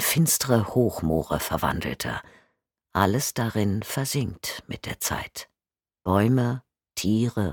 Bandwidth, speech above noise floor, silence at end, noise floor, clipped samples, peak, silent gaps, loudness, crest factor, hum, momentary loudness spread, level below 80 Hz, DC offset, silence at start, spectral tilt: 19 kHz; over 65 dB; 0 s; under -90 dBFS; under 0.1%; -4 dBFS; none; -25 LUFS; 22 dB; none; 13 LU; -46 dBFS; under 0.1%; 0 s; -4.5 dB/octave